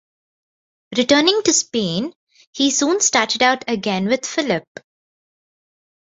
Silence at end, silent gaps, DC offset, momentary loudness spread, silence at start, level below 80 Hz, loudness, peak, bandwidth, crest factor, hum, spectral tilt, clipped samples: 1.4 s; 2.15-2.27 s, 2.47-2.53 s; under 0.1%; 10 LU; 0.9 s; -62 dBFS; -17 LUFS; -2 dBFS; 8 kHz; 20 dB; none; -2.5 dB/octave; under 0.1%